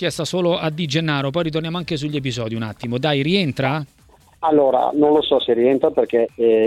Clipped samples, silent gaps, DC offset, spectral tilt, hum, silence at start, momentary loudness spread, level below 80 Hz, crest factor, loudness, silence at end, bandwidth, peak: under 0.1%; none; under 0.1%; -6 dB/octave; none; 0 s; 9 LU; -52 dBFS; 16 dB; -19 LUFS; 0 s; 13 kHz; -4 dBFS